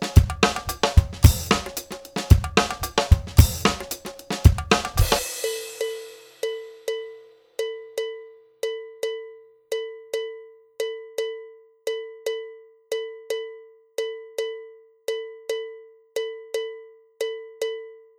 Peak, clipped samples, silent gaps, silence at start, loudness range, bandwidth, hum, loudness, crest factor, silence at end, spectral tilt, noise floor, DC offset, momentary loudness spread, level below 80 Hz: -2 dBFS; under 0.1%; none; 0 s; 12 LU; over 20 kHz; none; -25 LUFS; 24 dB; 0.2 s; -5 dB/octave; -47 dBFS; under 0.1%; 17 LU; -28 dBFS